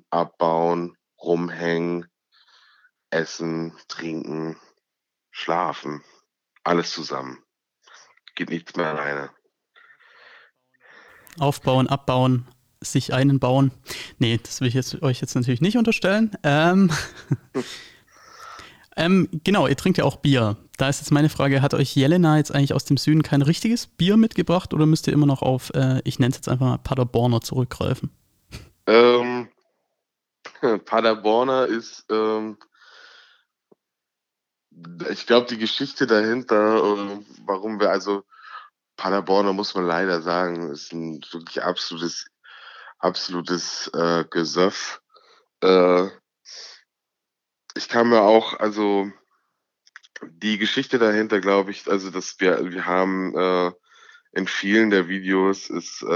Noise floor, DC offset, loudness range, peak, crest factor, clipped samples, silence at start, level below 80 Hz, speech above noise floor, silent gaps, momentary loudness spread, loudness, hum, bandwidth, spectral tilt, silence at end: -84 dBFS; under 0.1%; 9 LU; 0 dBFS; 22 dB; under 0.1%; 0.1 s; -56 dBFS; 63 dB; none; 15 LU; -21 LUFS; none; 15.5 kHz; -6 dB/octave; 0 s